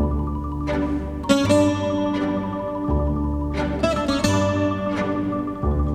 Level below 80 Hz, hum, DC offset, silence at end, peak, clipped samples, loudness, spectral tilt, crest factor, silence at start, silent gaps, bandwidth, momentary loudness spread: -30 dBFS; none; under 0.1%; 0 s; -2 dBFS; under 0.1%; -22 LUFS; -6.5 dB/octave; 20 dB; 0 s; none; 13.5 kHz; 7 LU